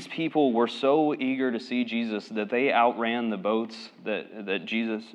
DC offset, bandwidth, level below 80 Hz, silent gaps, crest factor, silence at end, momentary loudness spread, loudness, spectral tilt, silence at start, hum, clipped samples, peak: under 0.1%; 9.6 kHz; under -90 dBFS; none; 18 dB; 0 s; 10 LU; -27 LUFS; -6 dB/octave; 0 s; none; under 0.1%; -10 dBFS